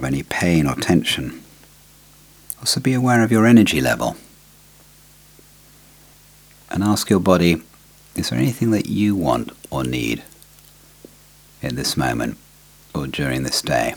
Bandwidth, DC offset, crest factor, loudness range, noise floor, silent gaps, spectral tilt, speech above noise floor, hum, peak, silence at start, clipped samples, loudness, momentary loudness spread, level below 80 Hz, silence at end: over 20 kHz; under 0.1%; 20 dB; 8 LU; -49 dBFS; none; -5 dB/octave; 30 dB; 50 Hz at -50 dBFS; 0 dBFS; 0 s; under 0.1%; -19 LUFS; 14 LU; -44 dBFS; 0 s